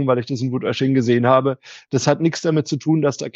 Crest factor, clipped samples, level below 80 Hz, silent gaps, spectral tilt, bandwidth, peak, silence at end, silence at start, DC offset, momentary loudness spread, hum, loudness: 16 dB; under 0.1%; -66 dBFS; none; -6 dB/octave; 8 kHz; -2 dBFS; 0.05 s; 0 s; under 0.1%; 8 LU; none; -19 LUFS